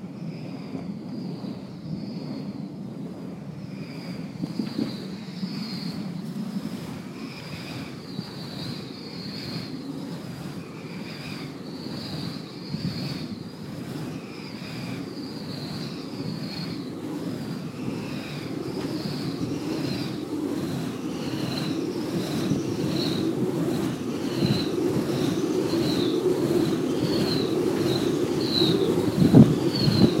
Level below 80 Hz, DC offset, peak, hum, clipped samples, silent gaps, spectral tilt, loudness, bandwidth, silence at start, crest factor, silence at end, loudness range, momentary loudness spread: -56 dBFS; under 0.1%; -2 dBFS; none; under 0.1%; none; -6.5 dB/octave; -28 LUFS; 16 kHz; 0 s; 26 dB; 0 s; 11 LU; 13 LU